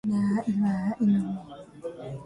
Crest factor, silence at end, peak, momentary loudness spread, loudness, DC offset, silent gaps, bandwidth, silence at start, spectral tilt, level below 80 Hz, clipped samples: 12 dB; 0 s; -14 dBFS; 15 LU; -27 LUFS; under 0.1%; none; 10 kHz; 0.05 s; -8.5 dB/octave; -60 dBFS; under 0.1%